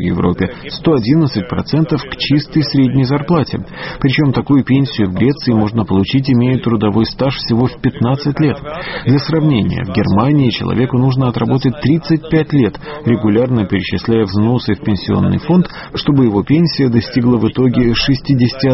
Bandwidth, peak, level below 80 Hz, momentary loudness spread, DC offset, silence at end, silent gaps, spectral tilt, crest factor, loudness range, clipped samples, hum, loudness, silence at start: 6 kHz; 0 dBFS; -36 dBFS; 5 LU; under 0.1%; 0 s; none; -6.5 dB/octave; 14 dB; 1 LU; under 0.1%; none; -14 LUFS; 0 s